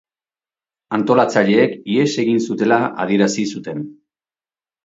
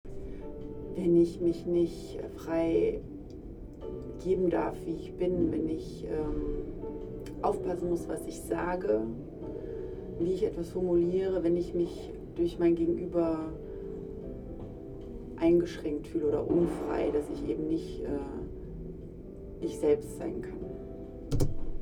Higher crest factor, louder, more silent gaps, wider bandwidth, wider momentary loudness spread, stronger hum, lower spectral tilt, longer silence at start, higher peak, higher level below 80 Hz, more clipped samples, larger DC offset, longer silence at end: about the same, 18 dB vs 20 dB; first, -17 LUFS vs -32 LUFS; neither; second, 7.8 kHz vs 13 kHz; second, 12 LU vs 16 LU; neither; second, -5.5 dB/octave vs -8 dB/octave; first, 0.9 s vs 0.05 s; first, 0 dBFS vs -12 dBFS; second, -64 dBFS vs -44 dBFS; neither; neither; first, 0.9 s vs 0 s